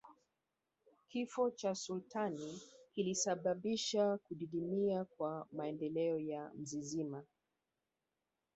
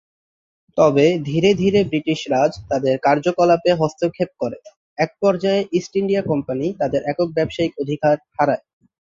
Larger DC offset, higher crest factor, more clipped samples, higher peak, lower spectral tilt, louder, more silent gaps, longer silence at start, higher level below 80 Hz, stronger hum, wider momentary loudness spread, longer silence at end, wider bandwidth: neither; about the same, 18 dB vs 18 dB; neither; second, -24 dBFS vs -2 dBFS; second, -5 dB/octave vs -6.5 dB/octave; second, -40 LUFS vs -19 LUFS; second, none vs 4.77-4.96 s; second, 0.05 s vs 0.75 s; second, -80 dBFS vs -52 dBFS; neither; about the same, 10 LU vs 8 LU; first, 1.3 s vs 0.5 s; about the same, 8 kHz vs 7.6 kHz